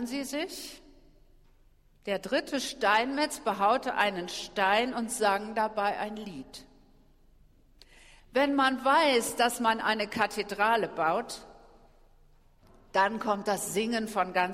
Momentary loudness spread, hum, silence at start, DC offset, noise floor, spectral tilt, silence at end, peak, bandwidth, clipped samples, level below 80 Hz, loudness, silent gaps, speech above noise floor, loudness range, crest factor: 12 LU; none; 0 s; under 0.1%; -61 dBFS; -3 dB/octave; 0 s; -12 dBFS; 16 kHz; under 0.1%; -60 dBFS; -28 LUFS; none; 32 dB; 6 LU; 20 dB